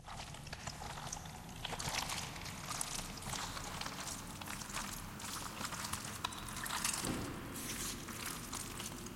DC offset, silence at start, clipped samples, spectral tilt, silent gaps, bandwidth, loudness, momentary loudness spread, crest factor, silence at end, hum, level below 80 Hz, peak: under 0.1%; 0 s; under 0.1%; -2.5 dB/octave; none; 16.5 kHz; -42 LUFS; 7 LU; 24 dB; 0 s; none; -56 dBFS; -20 dBFS